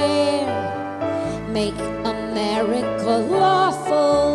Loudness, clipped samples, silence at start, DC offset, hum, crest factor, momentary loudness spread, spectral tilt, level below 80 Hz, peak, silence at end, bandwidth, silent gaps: -21 LUFS; under 0.1%; 0 s; under 0.1%; none; 14 dB; 8 LU; -5 dB/octave; -46 dBFS; -6 dBFS; 0 s; 12 kHz; none